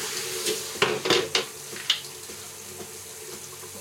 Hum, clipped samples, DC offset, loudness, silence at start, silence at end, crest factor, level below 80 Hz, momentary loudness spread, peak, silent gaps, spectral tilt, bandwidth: none; under 0.1%; under 0.1%; -28 LUFS; 0 s; 0 s; 24 dB; -70 dBFS; 15 LU; -6 dBFS; none; -1.5 dB/octave; 16.5 kHz